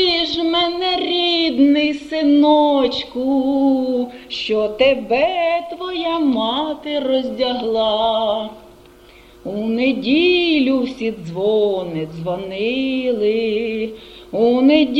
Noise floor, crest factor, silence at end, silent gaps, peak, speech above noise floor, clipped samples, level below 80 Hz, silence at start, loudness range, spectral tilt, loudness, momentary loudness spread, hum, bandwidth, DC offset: -45 dBFS; 16 dB; 0 s; none; -2 dBFS; 28 dB; under 0.1%; -50 dBFS; 0 s; 4 LU; -5.5 dB/octave; -18 LUFS; 11 LU; none; 8 kHz; under 0.1%